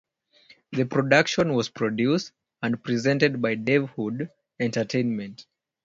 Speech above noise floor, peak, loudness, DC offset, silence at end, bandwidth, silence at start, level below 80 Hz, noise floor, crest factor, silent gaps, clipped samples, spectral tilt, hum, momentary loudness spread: 33 dB; -4 dBFS; -25 LUFS; under 0.1%; 0.4 s; 7.8 kHz; 0.7 s; -64 dBFS; -57 dBFS; 22 dB; none; under 0.1%; -5.5 dB/octave; none; 13 LU